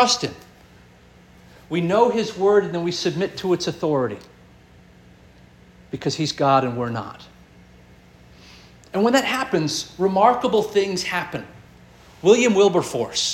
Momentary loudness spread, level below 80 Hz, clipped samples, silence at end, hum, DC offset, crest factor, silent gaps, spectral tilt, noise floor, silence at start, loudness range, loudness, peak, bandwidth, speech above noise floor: 12 LU; -56 dBFS; under 0.1%; 0 s; 60 Hz at -55 dBFS; under 0.1%; 20 dB; none; -4.5 dB/octave; -50 dBFS; 0 s; 6 LU; -20 LUFS; -2 dBFS; 16.5 kHz; 29 dB